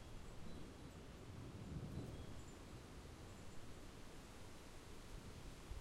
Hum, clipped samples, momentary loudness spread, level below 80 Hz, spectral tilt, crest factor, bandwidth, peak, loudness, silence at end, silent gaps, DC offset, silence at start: none; under 0.1%; 7 LU; -60 dBFS; -5.5 dB/octave; 16 dB; 16 kHz; -38 dBFS; -56 LUFS; 0 s; none; under 0.1%; 0 s